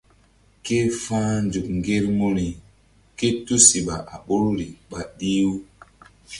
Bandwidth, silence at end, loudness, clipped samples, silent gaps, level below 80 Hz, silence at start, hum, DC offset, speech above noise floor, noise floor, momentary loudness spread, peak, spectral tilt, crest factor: 11.5 kHz; 0 s; -21 LUFS; under 0.1%; none; -46 dBFS; 0.65 s; none; under 0.1%; 35 dB; -57 dBFS; 19 LU; 0 dBFS; -4 dB/octave; 22 dB